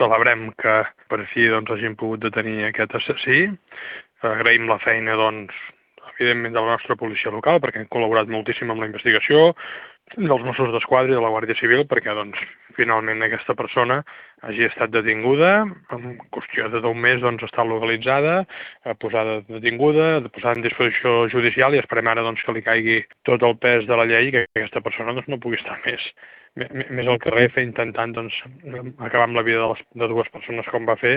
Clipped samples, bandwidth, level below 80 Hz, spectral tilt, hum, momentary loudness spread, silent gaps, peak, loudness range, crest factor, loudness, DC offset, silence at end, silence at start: under 0.1%; 5.2 kHz; -62 dBFS; -9 dB/octave; none; 14 LU; none; 0 dBFS; 4 LU; 20 dB; -20 LUFS; under 0.1%; 0 s; 0 s